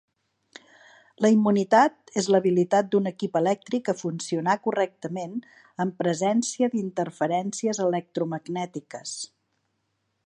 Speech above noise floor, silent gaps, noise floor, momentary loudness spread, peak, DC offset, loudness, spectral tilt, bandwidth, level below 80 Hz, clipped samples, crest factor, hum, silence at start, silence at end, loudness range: 51 dB; none; -75 dBFS; 14 LU; -6 dBFS; under 0.1%; -25 LUFS; -5.5 dB/octave; 11 kHz; -76 dBFS; under 0.1%; 20 dB; none; 1.2 s; 1 s; 6 LU